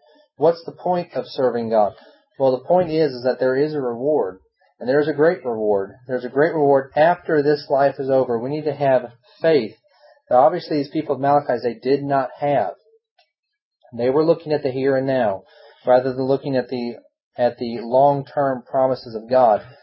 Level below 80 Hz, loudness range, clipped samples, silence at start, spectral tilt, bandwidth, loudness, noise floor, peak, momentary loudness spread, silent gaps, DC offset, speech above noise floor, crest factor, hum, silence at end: -64 dBFS; 3 LU; under 0.1%; 0.4 s; -11 dB/octave; 5.8 kHz; -20 LUFS; -65 dBFS; -2 dBFS; 9 LU; 13.11-13.16 s, 13.39-13.43 s, 13.62-13.71 s, 17.23-17.31 s; under 0.1%; 45 dB; 18 dB; none; 0.1 s